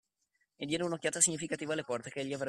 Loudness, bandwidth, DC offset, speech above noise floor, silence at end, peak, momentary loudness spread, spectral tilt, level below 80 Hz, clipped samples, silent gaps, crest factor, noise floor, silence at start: -33 LUFS; 13.5 kHz; under 0.1%; 45 dB; 0 s; -12 dBFS; 11 LU; -2.5 dB/octave; -72 dBFS; under 0.1%; none; 24 dB; -80 dBFS; 0.6 s